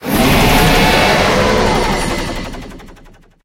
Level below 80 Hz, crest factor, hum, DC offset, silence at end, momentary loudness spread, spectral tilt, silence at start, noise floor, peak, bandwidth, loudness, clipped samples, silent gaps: -22 dBFS; 12 dB; none; under 0.1%; 0.5 s; 14 LU; -4.5 dB/octave; 0 s; -42 dBFS; 0 dBFS; 17 kHz; -12 LUFS; under 0.1%; none